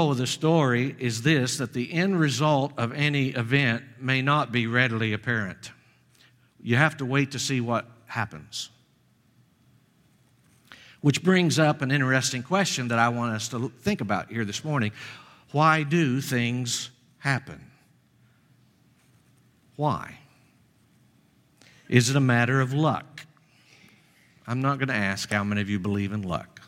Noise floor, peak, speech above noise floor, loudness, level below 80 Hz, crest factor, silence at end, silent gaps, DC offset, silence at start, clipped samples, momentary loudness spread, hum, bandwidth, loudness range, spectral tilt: -63 dBFS; -4 dBFS; 39 dB; -25 LUFS; -64 dBFS; 24 dB; 0.1 s; none; under 0.1%; 0 s; under 0.1%; 12 LU; none; 16 kHz; 10 LU; -5 dB/octave